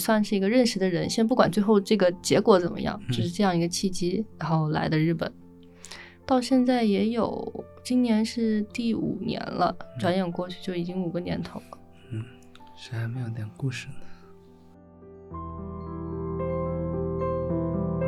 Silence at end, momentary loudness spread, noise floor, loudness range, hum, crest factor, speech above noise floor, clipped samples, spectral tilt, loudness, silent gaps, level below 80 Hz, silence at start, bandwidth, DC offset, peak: 0 s; 16 LU; -51 dBFS; 13 LU; none; 20 dB; 26 dB; under 0.1%; -6 dB/octave; -26 LUFS; none; -52 dBFS; 0 s; 13 kHz; under 0.1%; -6 dBFS